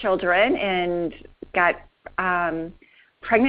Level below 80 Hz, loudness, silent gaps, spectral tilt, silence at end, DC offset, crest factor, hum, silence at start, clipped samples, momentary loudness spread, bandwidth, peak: -50 dBFS; -23 LUFS; none; -2.5 dB/octave; 0 s; under 0.1%; 20 dB; none; 0 s; under 0.1%; 15 LU; 5.2 kHz; -4 dBFS